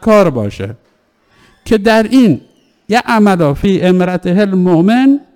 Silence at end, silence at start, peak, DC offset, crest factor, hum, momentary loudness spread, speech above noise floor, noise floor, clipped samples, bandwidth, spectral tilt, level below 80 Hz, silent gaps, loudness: 0.15 s; 0 s; 0 dBFS; under 0.1%; 10 dB; none; 10 LU; 44 dB; -54 dBFS; under 0.1%; 17 kHz; -7 dB/octave; -38 dBFS; none; -11 LUFS